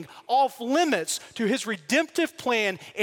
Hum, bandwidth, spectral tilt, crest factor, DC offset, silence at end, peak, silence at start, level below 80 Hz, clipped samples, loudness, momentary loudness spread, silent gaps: none; 17 kHz; -3 dB/octave; 18 dB; under 0.1%; 0 s; -8 dBFS; 0 s; -76 dBFS; under 0.1%; -25 LUFS; 5 LU; none